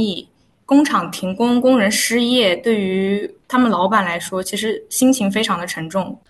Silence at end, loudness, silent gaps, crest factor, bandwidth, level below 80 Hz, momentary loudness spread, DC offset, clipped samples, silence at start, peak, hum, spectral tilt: 0.15 s; -17 LUFS; none; 16 dB; 12.5 kHz; -58 dBFS; 8 LU; under 0.1%; under 0.1%; 0 s; -2 dBFS; none; -4 dB/octave